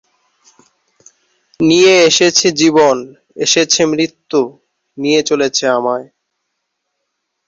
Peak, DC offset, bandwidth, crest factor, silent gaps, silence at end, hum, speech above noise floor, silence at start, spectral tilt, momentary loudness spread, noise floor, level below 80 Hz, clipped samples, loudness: 0 dBFS; under 0.1%; 7.8 kHz; 14 dB; none; 1.45 s; none; 60 dB; 1.6 s; -2.5 dB/octave; 12 LU; -72 dBFS; -58 dBFS; under 0.1%; -12 LUFS